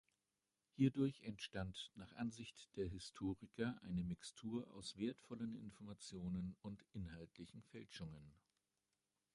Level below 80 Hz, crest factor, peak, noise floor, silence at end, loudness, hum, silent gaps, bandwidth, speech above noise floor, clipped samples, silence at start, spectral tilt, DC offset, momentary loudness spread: -66 dBFS; 24 dB; -24 dBFS; under -90 dBFS; 1.05 s; -48 LUFS; none; none; 11.5 kHz; over 43 dB; under 0.1%; 0.8 s; -6 dB/octave; under 0.1%; 14 LU